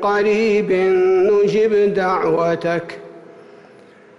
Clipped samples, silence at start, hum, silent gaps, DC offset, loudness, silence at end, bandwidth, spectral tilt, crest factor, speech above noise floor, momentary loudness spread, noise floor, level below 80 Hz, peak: under 0.1%; 0 s; none; none; under 0.1%; -16 LUFS; 1 s; 7.6 kHz; -6.5 dB/octave; 8 dB; 29 dB; 8 LU; -45 dBFS; -56 dBFS; -8 dBFS